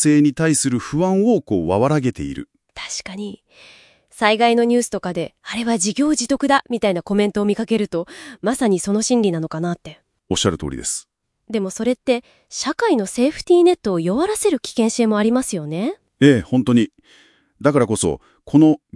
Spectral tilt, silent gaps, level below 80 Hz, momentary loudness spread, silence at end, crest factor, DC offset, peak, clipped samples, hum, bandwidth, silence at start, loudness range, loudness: -5 dB/octave; none; -50 dBFS; 12 LU; 0.2 s; 18 dB; under 0.1%; 0 dBFS; under 0.1%; none; 12 kHz; 0 s; 4 LU; -19 LUFS